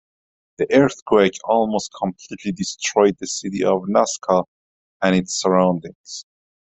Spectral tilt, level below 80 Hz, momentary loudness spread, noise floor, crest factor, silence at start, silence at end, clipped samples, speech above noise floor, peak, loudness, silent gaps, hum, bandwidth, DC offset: -4.5 dB/octave; -58 dBFS; 12 LU; under -90 dBFS; 18 dB; 0.6 s; 0.55 s; under 0.1%; over 71 dB; -2 dBFS; -19 LUFS; 1.02-1.06 s, 4.48-5.00 s, 5.95-6.04 s; none; 8.4 kHz; under 0.1%